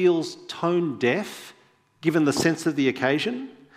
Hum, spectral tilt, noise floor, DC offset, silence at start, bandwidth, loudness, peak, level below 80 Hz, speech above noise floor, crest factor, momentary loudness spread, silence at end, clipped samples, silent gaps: none; -5 dB/octave; -53 dBFS; under 0.1%; 0 s; 15.5 kHz; -24 LUFS; -6 dBFS; -66 dBFS; 30 dB; 18 dB; 11 LU; 0.25 s; under 0.1%; none